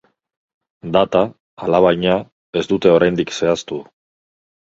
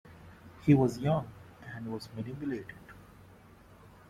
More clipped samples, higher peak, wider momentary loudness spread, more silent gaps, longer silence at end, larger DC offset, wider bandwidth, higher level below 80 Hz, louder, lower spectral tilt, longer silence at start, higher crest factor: neither; first, 0 dBFS vs -12 dBFS; second, 13 LU vs 27 LU; first, 1.40-1.57 s, 2.32-2.53 s vs none; first, 0.85 s vs 0.2 s; neither; second, 8 kHz vs 14 kHz; first, -50 dBFS vs -62 dBFS; first, -17 LUFS vs -31 LUFS; second, -6 dB/octave vs -8 dB/octave; first, 0.85 s vs 0.05 s; about the same, 18 dB vs 22 dB